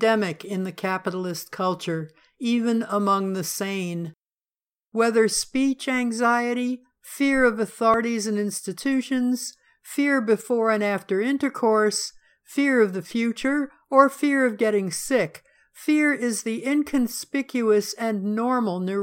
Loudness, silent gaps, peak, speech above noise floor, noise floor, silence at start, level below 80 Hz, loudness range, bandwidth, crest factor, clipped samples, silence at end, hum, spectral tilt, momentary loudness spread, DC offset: -23 LUFS; none; -2 dBFS; over 67 dB; under -90 dBFS; 0 s; -60 dBFS; 4 LU; 17 kHz; 20 dB; under 0.1%; 0 s; none; -4.5 dB/octave; 10 LU; under 0.1%